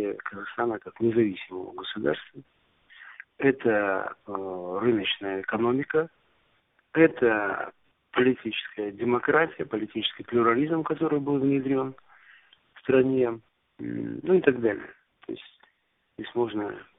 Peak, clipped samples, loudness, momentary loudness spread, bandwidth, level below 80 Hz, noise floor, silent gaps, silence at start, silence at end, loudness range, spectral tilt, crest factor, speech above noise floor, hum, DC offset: -4 dBFS; under 0.1%; -27 LUFS; 14 LU; 3.9 kHz; -66 dBFS; -72 dBFS; none; 0 s; 0.15 s; 4 LU; -2.5 dB/octave; 22 dB; 46 dB; none; under 0.1%